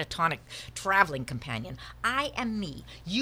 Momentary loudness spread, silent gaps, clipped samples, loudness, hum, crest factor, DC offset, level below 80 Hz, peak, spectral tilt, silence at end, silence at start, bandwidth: 15 LU; none; under 0.1%; -30 LUFS; none; 24 dB; under 0.1%; -52 dBFS; -6 dBFS; -4 dB/octave; 0 s; 0 s; 19.5 kHz